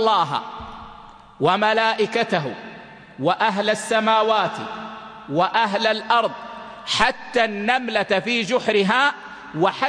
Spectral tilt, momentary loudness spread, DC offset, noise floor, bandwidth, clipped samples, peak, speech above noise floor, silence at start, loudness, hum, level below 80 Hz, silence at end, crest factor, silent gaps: -4 dB/octave; 18 LU; under 0.1%; -43 dBFS; 10.5 kHz; under 0.1%; -4 dBFS; 23 dB; 0 s; -20 LUFS; none; -54 dBFS; 0 s; 18 dB; none